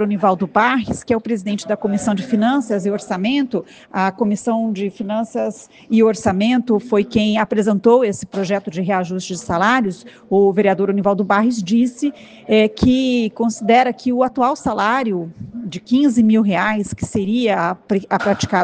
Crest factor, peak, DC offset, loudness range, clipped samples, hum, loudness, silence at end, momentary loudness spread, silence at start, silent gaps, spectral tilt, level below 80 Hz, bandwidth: 16 dB; -2 dBFS; under 0.1%; 3 LU; under 0.1%; none; -17 LUFS; 0 s; 9 LU; 0 s; none; -6 dB/octave; -48 dBFS; 9.6 kHz